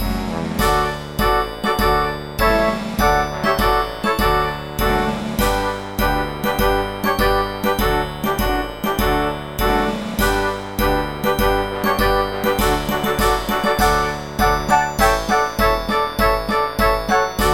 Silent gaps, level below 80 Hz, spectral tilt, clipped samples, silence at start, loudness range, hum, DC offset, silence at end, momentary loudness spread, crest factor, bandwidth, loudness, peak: none; -28 dBFS; -4.5 dB/octave; under 0.1%; 0 s; 2 LU; none; 0.6%; 0 s; 5 LU; 16 dB; 17 kHz; -19 LUFS; -2 dBFS